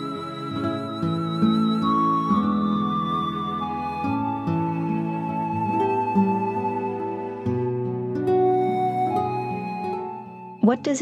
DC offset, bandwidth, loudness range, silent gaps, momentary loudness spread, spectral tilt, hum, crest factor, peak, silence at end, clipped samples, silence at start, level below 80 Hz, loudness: under 0.1%; 10.5 kHz; 2 LU; none; 8 LU; -7 dB/octave; none; 16 dB; -6 dBFS; 0 s; under 0.1%; 0 s; -58 dBFS; -24 LUFS